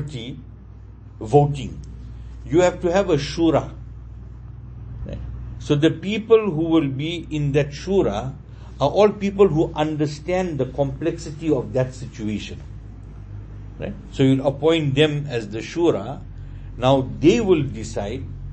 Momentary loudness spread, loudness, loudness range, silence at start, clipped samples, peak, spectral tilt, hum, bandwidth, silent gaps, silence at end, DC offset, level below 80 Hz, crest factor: 21 LU; -21 LUFS; 4 LU; 0 s; under 0.1%; -2 dBFS; -7 dB/octave; none; 8.6 kHz; none; 0 s; under 0.1%; -38 dBFS; 20 dB